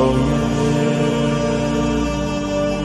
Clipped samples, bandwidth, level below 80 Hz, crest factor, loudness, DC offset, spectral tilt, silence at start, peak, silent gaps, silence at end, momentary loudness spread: under 0.1%; 12 kHz; -32 dBFS; 14 dB; -19 LUFS; under 0.1%; -6.5 dB/octave; 0 s; -4 dBFS; none; 0 s; 3 LU